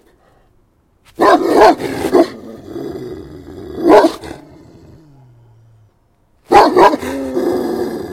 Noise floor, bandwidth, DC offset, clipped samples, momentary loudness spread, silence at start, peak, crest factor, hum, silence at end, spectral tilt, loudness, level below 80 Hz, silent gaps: -55 dBFS; 16.5 kHz; under 0.1%; 0.3%; 21 LU; 1.2 s; 0 dBFS; 16 dB; none; 0 s; -5 dB/octave; -12 LUFS; -46 dBFS; none